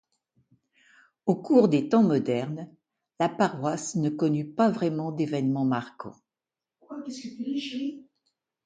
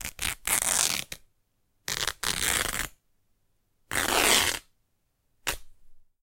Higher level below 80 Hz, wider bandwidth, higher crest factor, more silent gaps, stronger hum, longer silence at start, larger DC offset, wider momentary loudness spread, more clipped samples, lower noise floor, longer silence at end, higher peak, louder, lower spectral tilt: second, -72 dBFS vs -48 dBFS; second, 9.4 kHz vs 17 kHz; second, 20 dB vs 28 dB; neither; neither; first, 1.25 s vs 0 s; neither; about the same, 18 LU vs 17 LU; neither; first, under -90 dBFS vs -73 dBFS; first, 0.65 s vs 0.25 s; second, -8 dBFS vs -4 dBFS; about the same, -26 LUFS vs -26 LUFS; first, -6.5 dB/octave vs 0 dB/octave